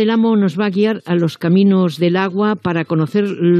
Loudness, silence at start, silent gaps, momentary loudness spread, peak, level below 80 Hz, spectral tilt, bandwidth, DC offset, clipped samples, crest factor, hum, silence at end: -16 LUFS; 0 s; none; 5 LU; -2 dBFS; -64 dBFS; -8 dB/octave; 9.2 kHz; under 0.1%; under 0.1%; 12 dB; none; 0 s